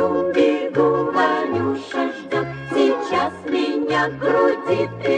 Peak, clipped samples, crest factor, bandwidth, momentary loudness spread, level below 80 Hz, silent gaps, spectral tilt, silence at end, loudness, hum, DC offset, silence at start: -6 dBFS; under 0.1%; 14 dB; 9.4 kHz; 6 LU; -58 dBFS; none; -6 dB/octave; 0 s; -20 LUFS; none; under 0.1%; 0 s